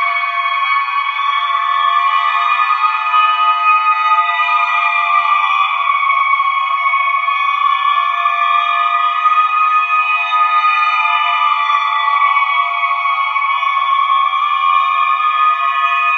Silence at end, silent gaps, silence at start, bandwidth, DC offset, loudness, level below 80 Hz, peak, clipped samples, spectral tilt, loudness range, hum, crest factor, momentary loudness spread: 0 s; none; 0 s; 6.6 kHz; under 0.1%; -13 LUFS; under -90 dBFS; 0 dBFS; under 0.1%; 5.5 dB/octave; 1 LU; none; 12 dB; 3 LU